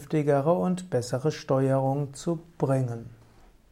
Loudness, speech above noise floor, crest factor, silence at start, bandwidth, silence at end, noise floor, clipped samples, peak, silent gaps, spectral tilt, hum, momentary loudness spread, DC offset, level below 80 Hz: -27 LUFS; 29 dB; 16 dB; 0 s; 13.5 kHz; 0.55 s; -55 dBFS; under 0.1%; -12 dBFS; none; -7.5 dB/octave; none; 9 LU; under 0.1%; -58 dBFS